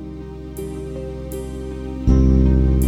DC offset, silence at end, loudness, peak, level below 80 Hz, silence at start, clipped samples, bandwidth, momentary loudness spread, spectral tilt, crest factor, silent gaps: under 0.1%; 0 s; -20 LUFS; -4 dBFS; -22 dBFS; 0 s; under 0.1%; 13 kHz; 17 LU; -8.5 dB/octave; 16 dB; none